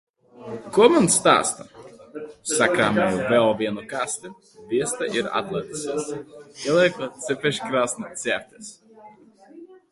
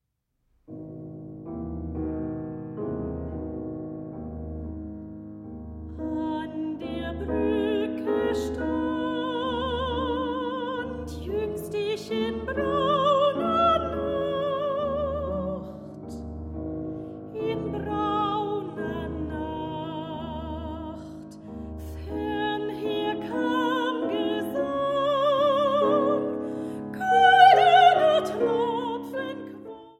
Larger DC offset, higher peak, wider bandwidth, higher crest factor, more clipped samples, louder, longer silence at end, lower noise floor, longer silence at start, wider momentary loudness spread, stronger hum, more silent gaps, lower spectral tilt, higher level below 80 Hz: neither; about the same, -2 dBFS vs -4 dBFS; second, 12 kHz vs 15 kHz; about the same, 22 dB vs 22 dB; neither; first, -22 LUFS vs -26 LUFS; about the same, 0.15 s vs 0.05 s; second, -49 dBFS vs -75 dBFS; second, 0.35 s vs 0.7 s; first, 21 LU vs 16 LU; neither; neither; second, -3.5 dB/octave vs -6 dB/octave; second, -60 dBFS vs -46 dBFS